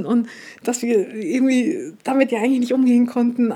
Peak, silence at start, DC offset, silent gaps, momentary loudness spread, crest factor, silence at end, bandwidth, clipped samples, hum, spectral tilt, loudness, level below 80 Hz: -2 dBFS; 0 s; under 0.1%; none; 9 LU; 16 dB; 0 s; 14 kHz; under 0.1%; none; -5 dB/octave; -19 LUFS; -76 dBFS